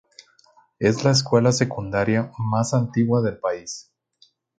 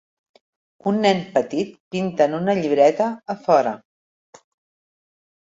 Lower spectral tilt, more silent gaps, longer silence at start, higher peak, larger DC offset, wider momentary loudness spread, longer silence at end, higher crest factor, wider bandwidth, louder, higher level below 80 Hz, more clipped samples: about the same, -5.5 dB/octave vs -6 dB/octave; second, none vs 1.80-1.91 s; about the same, 0.8 s vs 0.85 s; about the same, -4 dBFS vs -4 dBFS; neither; about the same, 9 LU vs 11 LU; second, 0.8 s vs 1.8 s; about the same, 20 dB vs 18 dB; first, 9.4 kHz vs 7.8 kHz; about the same, -21 LUFS vs -20 LUFS; first, -54 dBFS vs -66 dBFS; neither